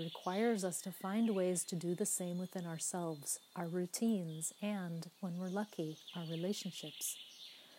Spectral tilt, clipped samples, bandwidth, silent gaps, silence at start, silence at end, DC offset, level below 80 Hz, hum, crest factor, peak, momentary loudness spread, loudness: -4.5 dB/octave; under 0.1%; 16 kHz; none; 0 s; 0 s; under 0.1%; under -90 dBFS; none; 16 dB; -24 dBFS; 9 LU; -40 LUFS